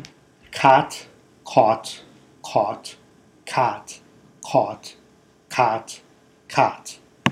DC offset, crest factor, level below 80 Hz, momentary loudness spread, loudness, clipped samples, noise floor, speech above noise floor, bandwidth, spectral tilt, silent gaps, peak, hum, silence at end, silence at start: under 0.1%; 22 dB; -66 dBFS; 22 LU; -21 LUFS; under 0.1%; -55 dBFS; 35 dB; 15 kHz; -4.5 dB/octave; none; 0 dBFS; none; 0 s; 0 s